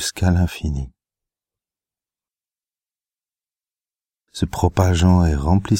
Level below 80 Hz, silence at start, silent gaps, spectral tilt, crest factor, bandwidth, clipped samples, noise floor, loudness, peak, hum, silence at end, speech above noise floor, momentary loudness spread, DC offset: -32 dBFS; 0 s; none; -6 dB/octave; 20 dB; 16 kHz; under 0.1%; under -90 dBFS; -19 LUFS; 0 dBFS; none; 0 s; over 73 dB; 14 LU; under 0.1%